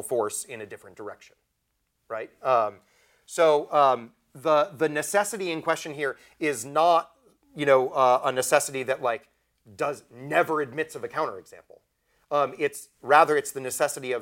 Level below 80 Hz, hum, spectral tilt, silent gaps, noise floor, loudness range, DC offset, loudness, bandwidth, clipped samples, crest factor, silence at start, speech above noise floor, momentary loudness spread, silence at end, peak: -74 dBFS; none; -3.5 dB/octave; none; -76 dBFS; 5 LU; under 0.1%; -25 LUFS; 17 kHz; under 0.1%; 22 dB; 0 s; 51 dB; 16 LU; 0 s; -4 dBFS